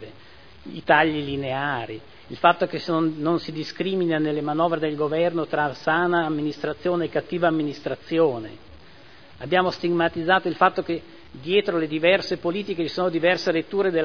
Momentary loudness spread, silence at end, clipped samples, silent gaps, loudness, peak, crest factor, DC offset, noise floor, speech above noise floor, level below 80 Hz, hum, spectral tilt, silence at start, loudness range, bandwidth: 11 LU; 0 s; under 0.1%; none; -23 LUFS; -2 dBFS; 22 dB; 0.4%; -49 dBFS; 26 dB; -58 dBFS; none; -6.5 dB/octave; 0 s; 2 LU; 5.4 kHz